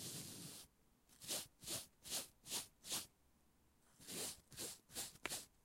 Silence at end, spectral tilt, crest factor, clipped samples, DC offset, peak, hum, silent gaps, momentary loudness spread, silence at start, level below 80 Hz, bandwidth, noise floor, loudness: 0.15 s; -1 dB/octave; 30 dB; under 0.1%; under 0.1%; -22 dBFS; none; none; 10 LU; 0 s; -78 dBFS; 16.5 kHz; -76 dBFS; -48 LUFS